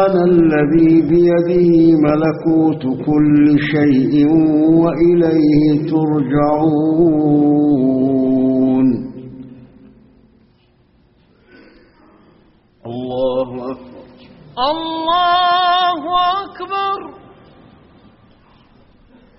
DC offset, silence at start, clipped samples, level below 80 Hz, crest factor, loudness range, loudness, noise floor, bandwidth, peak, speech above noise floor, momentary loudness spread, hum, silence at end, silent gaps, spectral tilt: under 0.1%; 0 s; under 0.1%; -46 dBFS; 14 dB; 13 LU; -14 LUFS; -54 dBFS; 5.8 kHz; -2 dBFS; 41 dB; 12 LU; none; 2.25 s; none; -6 dB/octave